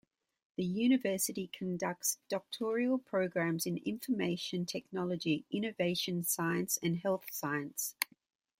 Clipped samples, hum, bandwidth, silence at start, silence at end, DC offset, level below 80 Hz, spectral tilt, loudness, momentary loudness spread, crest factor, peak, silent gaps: under 0.1%; none; 16.5 kHz; 0.6 s; 0.55 s; under 0.1%; -76 dBFS; -4 dB/octave; -35 LUFS; 6 LU; 24 dB; -10 dBFS; none